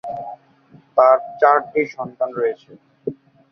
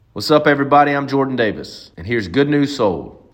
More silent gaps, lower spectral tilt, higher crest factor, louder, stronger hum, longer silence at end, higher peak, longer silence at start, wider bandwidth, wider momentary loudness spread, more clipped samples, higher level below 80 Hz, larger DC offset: neither; about the same, -7 dB/octave vs -6 dB/octave; about the same, 18 dB vs 16 dB; about the same, -18 LUFS vs -16 LUFS; neither; first, 0.4 s vs 0.2 s; about the same, -2 dBFS vs 0 dBFS; about the same, 0.05 s vs 0.15 s; second, 6.2 kHz vs 16.5 kHz; about the same, 17 LU vs 15 LU; neither; second, -66 dBFS vs -52 dBFS; neither